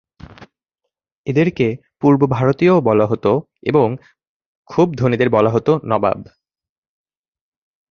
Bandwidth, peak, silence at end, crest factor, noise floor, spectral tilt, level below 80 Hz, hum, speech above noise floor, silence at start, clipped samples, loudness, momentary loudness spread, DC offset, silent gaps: 6.8 kHz; -2 dBFS; 1.7 s; 16 dB; -79 dBFS; -8.5 dB/octave; -50 dBFS; none; 64 dB; 0.4 s; under 0.1%; -16 LUFS; 7 LU; under 0.1%; 1.12-1.24 s, 4.27-4.40 s, 4.46-4.65 s